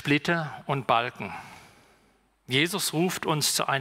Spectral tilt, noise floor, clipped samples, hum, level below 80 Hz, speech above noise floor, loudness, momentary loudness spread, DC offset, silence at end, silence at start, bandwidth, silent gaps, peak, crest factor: -3.5 dB/octave; -65 dBFS; under 0.1%; none; -66 dBFS; 38 dB; -26 LUFS; 14 LU; under 0.1%; 0 s; 0 s; 16 kHz; none; -8 dBFS; 20 dB